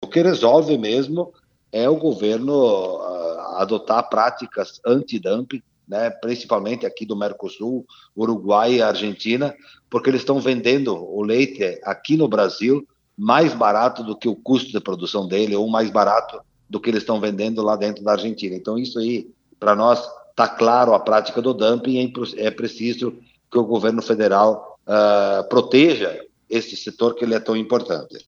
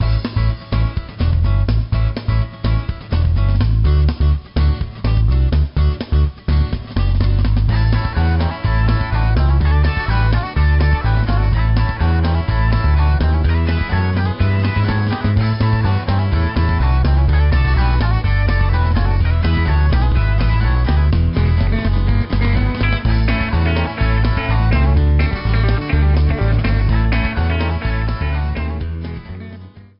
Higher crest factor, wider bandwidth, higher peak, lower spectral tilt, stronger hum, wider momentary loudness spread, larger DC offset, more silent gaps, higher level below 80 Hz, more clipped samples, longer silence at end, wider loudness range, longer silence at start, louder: first, 20 dB vs 10 dB; first, 7.2 kHz vs 5.6 kHz; first, 0 dBFS vs -4 dBFS; about the same, -6 dB/octave vs -6.5 dB/octave; neither; first, 11 LU vs 5 LU; neither; neither; second, -68 dBFS vs -18 dBFS; neither; about the same, 0.1 s vs 0.2 s; about the same, 4 LU vs 2 LU; about the same, 0 s vs 0 s; second, -20 LUFS vs -17 LUFS